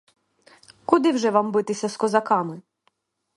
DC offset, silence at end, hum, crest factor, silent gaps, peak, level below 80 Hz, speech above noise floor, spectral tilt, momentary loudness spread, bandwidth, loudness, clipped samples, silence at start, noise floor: under 0.1%; 0.75 s; none; 22 dB; none; 0 dBFS; -68 dBFS; 47 dB; -5 dB/octave; 14 LU; 11.5 kHz; -22 LUFS; under 0.1%; 0.9 s; -69 dBFS